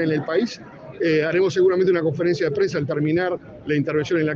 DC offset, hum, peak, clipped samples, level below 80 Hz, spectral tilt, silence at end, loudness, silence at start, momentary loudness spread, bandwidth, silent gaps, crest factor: under 0.1%; none; -8 dBFS; under 0.1%; -60 dBFS; -7 dB/octave; 0 s; -21 LUFS; 0 s; 9 LU; 7.4 kHz; none; 12 dB